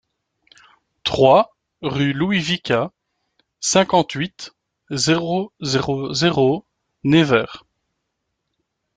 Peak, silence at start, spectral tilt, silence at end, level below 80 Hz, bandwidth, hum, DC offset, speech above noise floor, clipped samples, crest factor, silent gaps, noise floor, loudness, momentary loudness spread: -2 dBFS; 1.05 s; -4.5 dB/octave; 1.4 s; -54 dBFS; 9.6 kHz; none; under 0.1%; 58 dB; under 0.1%; 20 dB; none; -76 dBFS; -19 LUFS; 13 LU